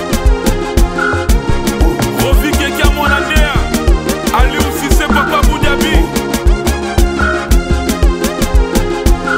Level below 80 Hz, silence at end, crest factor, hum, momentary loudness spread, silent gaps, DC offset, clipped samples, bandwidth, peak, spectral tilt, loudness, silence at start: -14 dBFS; 0 s; 12 dB; none; 3 LU; none; under 0.1%; under 0.1%; 16.5 kHz; 0 dBFS; -5 dB/octave; -13 LUFS; 0 s